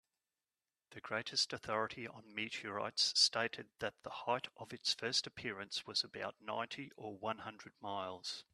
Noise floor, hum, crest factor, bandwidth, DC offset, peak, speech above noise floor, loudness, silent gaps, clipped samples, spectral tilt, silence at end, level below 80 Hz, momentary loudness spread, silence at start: under -90 dBFS; none; 26 dB; 13.5 kHz; under 0.1%; -16 dBFS; over 49 dB; -39 LUFS; none; under 0.1%; -1.5 dB/octave; 0.1 s; -80 dBFS; 14 LU; 0.9 s